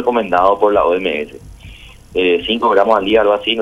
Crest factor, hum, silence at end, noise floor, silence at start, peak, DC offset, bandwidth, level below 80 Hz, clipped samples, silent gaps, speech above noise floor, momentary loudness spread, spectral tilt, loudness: 14 dB; none; 0 s; -37 dBFS; 0 s; 0 dBFS; under 0.1%; 11.5 kHz; -42 dBFS; under 0.1%; none; 23 dB; 9 LU; -5.5 dB/octave; -14 LUFS